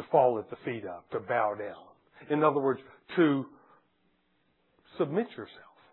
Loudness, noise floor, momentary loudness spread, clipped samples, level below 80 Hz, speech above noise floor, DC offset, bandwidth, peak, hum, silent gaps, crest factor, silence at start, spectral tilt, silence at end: -30 LUFS; -73 dBFS; 16 LU; under 0.1%; -78 dBFS; 44 dB; under 0.1%; 4.2 kHz; -10 dBFS; none; none; 22 dB; 0 s; -10.5 dB/octave; 0.3 s